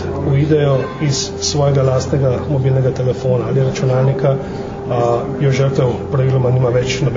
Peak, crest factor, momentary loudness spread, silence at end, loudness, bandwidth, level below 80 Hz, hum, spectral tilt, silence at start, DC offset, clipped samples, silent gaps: -2 dBFS; 14 dB; 4 LU; 0 s; -16 LUFS; 7.6 kHz; -38 dBFS; none; -6.5 dB/octave; 0 s; under 0.1%; under 0.1%; none